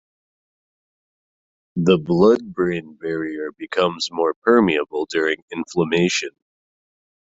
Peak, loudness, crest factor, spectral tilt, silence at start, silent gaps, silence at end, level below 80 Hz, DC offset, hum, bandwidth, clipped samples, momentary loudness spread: -2 dBFS; -20 LUFS; 18 dB; -5.5 dB/octave; 1.75 s; 4.36-4.42 s, 5.42-5.48 s; 1 s; -58 dBFS; under 0.1%; none; 8 kHz; under 0.1%; 12 LU